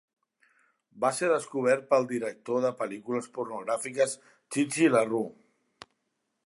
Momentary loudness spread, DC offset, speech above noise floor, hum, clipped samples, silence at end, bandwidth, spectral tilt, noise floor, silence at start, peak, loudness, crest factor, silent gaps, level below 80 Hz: 11 LU; under 0.1%; 52 dB; none; under 0.1%; 1.15 s; 11.5 kHz; -4.5 dB/octave; -80 dBFS; 0.95 s; -10 dBFS; -28 LUFS; 20 dB; none; -82 dBFS